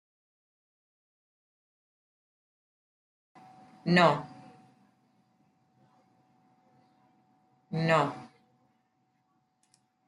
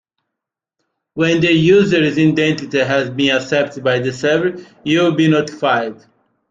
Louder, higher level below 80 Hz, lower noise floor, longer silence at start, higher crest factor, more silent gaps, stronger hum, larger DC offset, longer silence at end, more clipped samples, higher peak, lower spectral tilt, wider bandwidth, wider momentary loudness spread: second, -27 LUFS vs -15 LUFS; second, -78 dBFS vs -54 dBFS; second, -74 dBFS vs -82 dBFS; first, 3.85 s vs 1.15 s; first, 28 dB vs 14 dB; neither; neither; neither; first, 1.8 s vs 0.55 s; neither; second, -8 dBFS vs -2 dBFS; about the same, -6.5 dB/octave vs -6 dB/octave; first, 11 kHz vs 7.8 kHz; first, 20 LU vs 7 LU